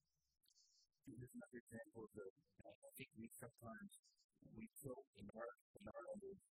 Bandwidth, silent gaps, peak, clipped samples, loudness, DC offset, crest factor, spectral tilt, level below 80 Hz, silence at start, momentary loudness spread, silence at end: 15.5 kHz; 1.60-1.67 s, 2.30-2.36 s, 2.75-2.82 s, 3.99-4.03 s, 4.24-4.29 s, 5.07-5.13 s, 5.61-5.74 s; -40 dBFS; under 0.1%; -59 LUFS; under 0.1%; 20 dB; -5.5 dB/octave; -82 dBFS; 0.55 s; 9 LU; 0.05 s